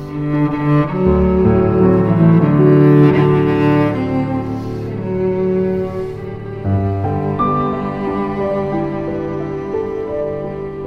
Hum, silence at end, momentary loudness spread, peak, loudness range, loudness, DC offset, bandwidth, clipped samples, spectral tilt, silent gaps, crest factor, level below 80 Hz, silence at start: none; 0 s; 12 LU; 0 dBFS; 8 LU; -16 LUFS; under 0.1%; 5.6 kHz; under 0.1%; -10.5 dB/octave; none; 14 dB; -34 dBFS; 0 s